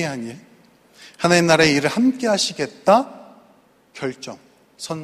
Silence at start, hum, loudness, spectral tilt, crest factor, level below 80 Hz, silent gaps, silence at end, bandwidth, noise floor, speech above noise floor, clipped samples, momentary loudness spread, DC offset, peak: 0 s; none; -18 LUFS; -4 dB/octave; 20 dB; -58 dBFS; none; 0 s; 15 kHz; -55 dBFS; 36 dB; under 0.1%; 20 LU; under 0.1%; 0 dBFS